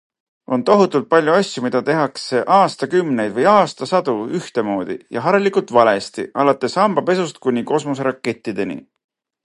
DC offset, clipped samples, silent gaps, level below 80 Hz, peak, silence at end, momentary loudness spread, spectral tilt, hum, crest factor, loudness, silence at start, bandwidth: under 0.1%; under 0.1%; none; -64 dBFS; 0 dBFS; 0.65 s; 10 LU; -5.5 dB/octave; none; 18 dB; -17 LUFS; 0.5 s; 11.5 kHz